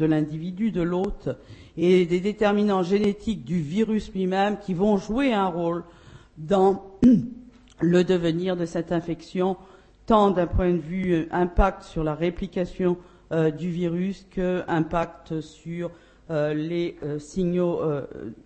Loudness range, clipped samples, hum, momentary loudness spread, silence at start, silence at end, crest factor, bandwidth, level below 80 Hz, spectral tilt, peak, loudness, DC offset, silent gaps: 5 LU; under 0.1%; none; 12 LU; 0 s; 0.1 s; 18 dB; 8.6 kHz; -40 dBFS; -7.5 dB/octave; -6 dBFS; -24 LUFS; under 0.1%; none